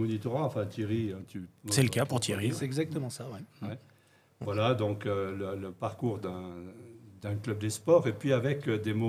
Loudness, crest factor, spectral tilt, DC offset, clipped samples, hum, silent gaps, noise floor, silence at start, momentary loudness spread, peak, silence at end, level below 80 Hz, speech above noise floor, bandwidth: -32 LUFS; 22 dB; -5.5 dB/octave; under 0.1%; under 0.1%; none; none; -63 dBFS; 0 s; 16 LU; -10 dBFS; 0 s; -70 dBFS; 32 dB; 16 kHz